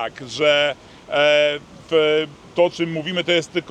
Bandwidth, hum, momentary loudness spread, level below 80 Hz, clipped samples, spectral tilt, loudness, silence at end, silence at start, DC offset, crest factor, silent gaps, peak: 9.4 kHz; none; 10 LU; -60 dBFS; under 0.1%; -4 dB/octave; -19 LUFS; 0 s; 0 s; under 0.1%; 16 dB; none; -4 dBFS